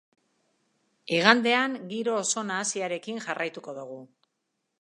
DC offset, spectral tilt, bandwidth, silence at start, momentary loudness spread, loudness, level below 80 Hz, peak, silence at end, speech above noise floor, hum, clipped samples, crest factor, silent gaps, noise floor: under 0.1%; -2.5 dB/octave; 11.5 kHz; 1.05 s; 20 LU; -26 LUFS; -84 dBFS; 0 dBFS; 0.75 s; 53 dB; none; under 0.1%; 28 dB; none; -80 dBFS